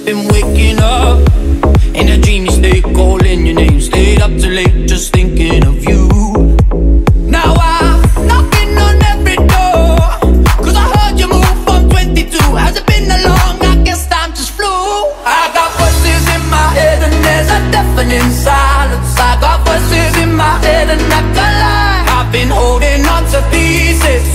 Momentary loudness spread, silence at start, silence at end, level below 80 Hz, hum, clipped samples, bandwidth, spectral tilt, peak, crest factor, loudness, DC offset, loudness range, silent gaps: 2 LU; 0 s; 0 s; -10 dBFS; none; under 0.1%; 16 kHz; -5 dB/octave; 0 dBFS; 8 dB; -10 LUFS; under 0.1%; 2 LU; none